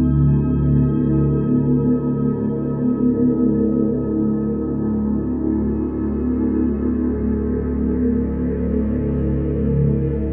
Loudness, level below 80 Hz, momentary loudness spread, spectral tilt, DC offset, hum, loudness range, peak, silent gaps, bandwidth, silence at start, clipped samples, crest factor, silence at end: -19 LUFS; -28 dBFS; 5 LU; -14.5 dB/octave; under 0.1%; none; 2 LU; -6 dBFS; none; 2.7 kHz; 0 s; under 0.1%; 12 dB; 0 s